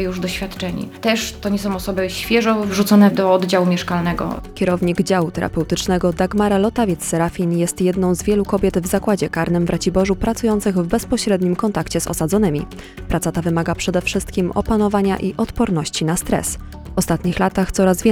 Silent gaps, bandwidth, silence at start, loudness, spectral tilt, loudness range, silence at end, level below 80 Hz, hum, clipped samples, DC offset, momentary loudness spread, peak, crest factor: none; 17.5 kHz; 0 s; -18 LUFS; -5.5 dB/octave; 3 LU; 0 s; -36 dBFS; none; under 0.1%; under 0.1%; 6 LU; -2 dBFS; 16 dB